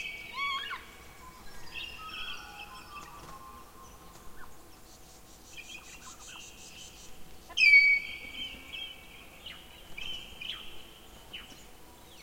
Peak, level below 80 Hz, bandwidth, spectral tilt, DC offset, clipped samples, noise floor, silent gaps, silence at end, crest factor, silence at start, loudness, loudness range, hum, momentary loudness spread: -10 dBFS; -58 dBFS; 16.5 kHz; -0.5 dB/octave; under 0.1%; under 0.1%; -53 dBFS; none; 0 s; 24 dB; 0 s; -27 LUFS; 22 LU; none; 26 LU